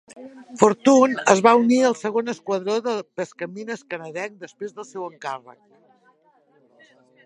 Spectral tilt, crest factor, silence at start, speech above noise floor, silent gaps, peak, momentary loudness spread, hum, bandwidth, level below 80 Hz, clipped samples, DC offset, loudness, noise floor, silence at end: -4.5 dB/octave; 22 dB; 0.15 s; 39 dB; none; 0 dBFS; 19 LU; none; 10.5 kHz; -66 dBFS; under 0.1%; under 0.1%; -20 LUFS; -60 dBFS; 1.75 s